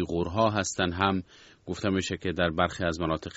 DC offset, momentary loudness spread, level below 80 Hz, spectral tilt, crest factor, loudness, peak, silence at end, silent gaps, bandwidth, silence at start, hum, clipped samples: under 0.1%; 7 LU; -50 dBFS; -4 dB/octave; 22 dB; -28 LUFS; -6 dBFS; 0 s; none; 8 kHz; 0 s; none; under 0.1%